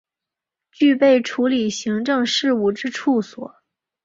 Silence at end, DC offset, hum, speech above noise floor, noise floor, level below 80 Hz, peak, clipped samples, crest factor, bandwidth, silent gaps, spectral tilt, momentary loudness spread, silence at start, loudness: 0.55 s; under 0.1%; none; 68 dB; -86 dBFS; -64 dBFS; -4 dBFS; under 0.1%; 16 dB; 7.8 kHz; none; -4 dB/octave; 9 LU; 0.8 s; -19 LUFS